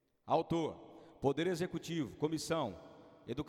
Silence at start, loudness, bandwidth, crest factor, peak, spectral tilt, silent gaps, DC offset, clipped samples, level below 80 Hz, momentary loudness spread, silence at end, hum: 0.25 s; -37 LUFS; 16 kHz; 18 dB; -20 dBFS; -5.5 dB/octave; none; under 0.1%; under 0.1%; -66 dBFS; 19 LU; 0 s; none